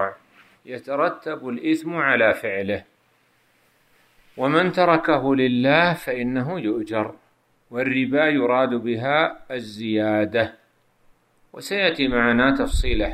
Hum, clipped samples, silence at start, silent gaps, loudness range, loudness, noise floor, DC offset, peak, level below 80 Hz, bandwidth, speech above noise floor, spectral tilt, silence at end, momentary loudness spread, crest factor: none; under 0.1%; 0 s; none; 3 LU; -21 LUFS; -62 dBFS; under 0.1%; -2 dBFS; -38 dBFS; 14.5 kHz; 42 dB; -6 dB/octave; 0 s; 12 LU; 20 dB